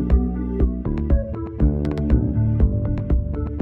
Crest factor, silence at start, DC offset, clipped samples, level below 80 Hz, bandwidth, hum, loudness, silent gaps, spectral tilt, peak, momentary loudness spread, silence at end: 16 dB; 0 s; under 0.1%; under 0.1%; -22 dBFS; 3.7 kHz; none; -22 LUFS; none; -11.5 dB/octave; -4 dBFS; 5 LU; 0 s